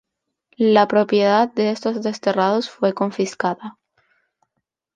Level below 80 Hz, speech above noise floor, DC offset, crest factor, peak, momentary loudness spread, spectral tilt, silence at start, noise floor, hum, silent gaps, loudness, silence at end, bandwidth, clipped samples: -70 dBFS; 59 dB; under 0.1%; 18 dB; -2 dBFS; 8 LU; -5.5 dB/octave; 0.6 s; -77 dBFS; none; none; -19 LUFS; 1.25 s; 9.4 kHz; under 0.1%